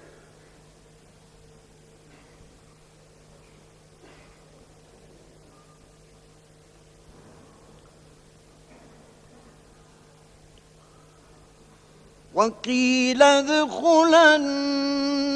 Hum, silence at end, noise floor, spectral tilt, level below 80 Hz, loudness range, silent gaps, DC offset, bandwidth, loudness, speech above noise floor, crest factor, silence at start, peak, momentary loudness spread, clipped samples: none; 0 s; -54 dBFS; -2.5 dB/octave; -60 dBFS; 13 LU; none; under 0.1%; 11 kHz; -19 LUFS; 34 dB; 24 dB; 12.35 s; -2 dBFS; 9 LU; under 0.1%